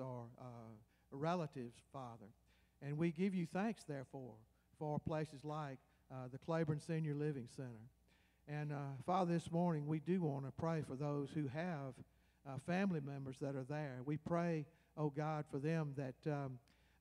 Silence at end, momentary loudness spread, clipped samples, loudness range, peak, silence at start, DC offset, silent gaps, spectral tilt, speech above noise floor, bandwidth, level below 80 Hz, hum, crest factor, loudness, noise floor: 0.4 s; 15 LU; under 0.1%; 4 LU; -26 dBFS; 0 s; under 0.1%; none; -8 dB/octave; 31 dB; 11.5 kHz; -74 dBFS; none; 18 dB; -44 LUFS; -74 dBFS